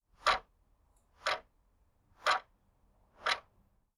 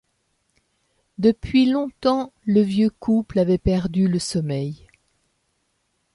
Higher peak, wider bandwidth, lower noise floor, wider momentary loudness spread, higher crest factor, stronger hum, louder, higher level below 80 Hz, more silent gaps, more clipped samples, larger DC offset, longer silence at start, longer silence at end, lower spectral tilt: second, -14 dBFS vs -6 dBFS; first, 14 kHz vs 11.5 kHz; about the same, -71 dBFS vs -71 dBFS; about the same, 7 LU vs 8 LU; first, 24 dB vs 16 dB; neither; second, -35 LUFS vs -21 LUFS; second, -66 dBFS vs -42 dBFS; neither; neither; neither; second, 0.25 s vs 1.2 s; second, 0.6 s vs 1.4 s; second, -0.5 dB/octave vs -7 dB/octave